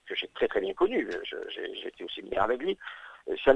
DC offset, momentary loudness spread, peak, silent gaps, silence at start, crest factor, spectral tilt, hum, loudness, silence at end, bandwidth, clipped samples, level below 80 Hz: under 0.1%; 11 LU; -6 dBFS; none; 0.05 s; 24 dB; -5.5 dB/octave; none; -31 LUFS; 0 s; 8.8 kHz; under 0.1%; -56 dBFS